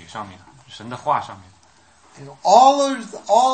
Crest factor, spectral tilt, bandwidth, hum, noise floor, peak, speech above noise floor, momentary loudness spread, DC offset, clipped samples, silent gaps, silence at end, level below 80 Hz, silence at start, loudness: 20 dB; -3.5 dB/octave; 8.8 kHz; none; -54 dBFS; 0 dBFS; 35 dB; 24 LU; under 0.1%; under 0.1%; none; 0 s; -66 dBFS; 0.15 s; -17 LUFS